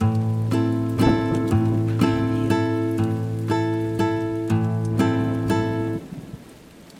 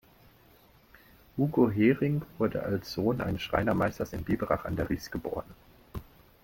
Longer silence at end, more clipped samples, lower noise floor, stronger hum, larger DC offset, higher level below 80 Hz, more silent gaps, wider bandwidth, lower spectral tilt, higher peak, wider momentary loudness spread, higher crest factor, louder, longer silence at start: second, 0 s vs 0.4 s; neither; second, -45 dBFS vs -59 dBFS; neither; neither; first, -44 dBFS vs -50 dBFS; neither; second, 15 kHz vs 17 kHz; about the same, -8 dB/octave vs -7.5 dB/octave; first, -4 dBFS vs -10 dBFS; second, 6 LU vs 15 LU; about the same, 16 dB vs 20 dB; first, -22 LUFS vs -30 LUFS; second, 0 s vs 1.35 s